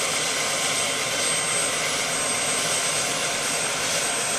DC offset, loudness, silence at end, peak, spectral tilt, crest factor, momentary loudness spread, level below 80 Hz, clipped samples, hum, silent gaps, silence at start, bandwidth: under 0.1%; -22 LUFS; 0 s; -10 dBFS; -0.5 dB/octave; 14 dB; 2 LU; -58 dBFS; under 0.1%; none; none; 0 s; 15.5 kHz